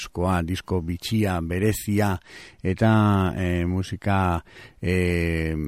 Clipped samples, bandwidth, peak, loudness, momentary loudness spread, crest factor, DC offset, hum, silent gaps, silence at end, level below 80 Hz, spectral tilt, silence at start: under 0.1%; 16 kHz; -8 dBFS; -24 LUFS; 9 LU; 14 dB; under 0.1%; none; none; 0 s; -40 dBFS; -6.5 dB/octave; 0 s